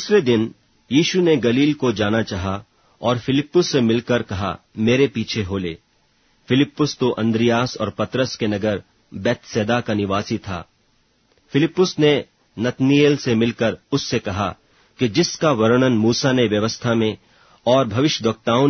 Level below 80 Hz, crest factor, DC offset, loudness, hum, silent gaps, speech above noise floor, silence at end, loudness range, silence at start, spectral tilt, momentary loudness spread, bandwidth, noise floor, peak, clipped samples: -52 dBFS; 18 dB; under 0.1%; -19 LUFS; none; none; 43 dB; 0 s; 3 LU; 0 s; -5.5 dB/octave; 10 LU; 6.6 kHz; -61 dBFS; -2 dBFS; under 0.1%